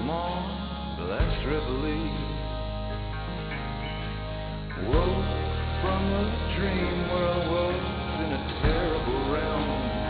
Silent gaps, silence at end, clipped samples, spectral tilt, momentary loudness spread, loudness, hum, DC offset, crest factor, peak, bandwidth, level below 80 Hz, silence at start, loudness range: none; 0 s; under 0.1%; -10.5 dB/octave; 7 LU; -29 LUFS; none; under 0.1%; 16 dB; -10 dBFS; 4 kHz; -34 dBFS; 0 s; 4 LU